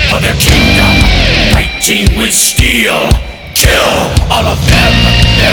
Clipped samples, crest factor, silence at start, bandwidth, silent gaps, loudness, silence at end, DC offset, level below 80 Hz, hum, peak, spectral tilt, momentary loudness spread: 1%; 8 dB; 0 s; over 20 kHz; none; -8 LUFS; 0 s; under 0.1%; -14 dBFS; none; 0 dBFS; -3.5 dB/octave; 5 LU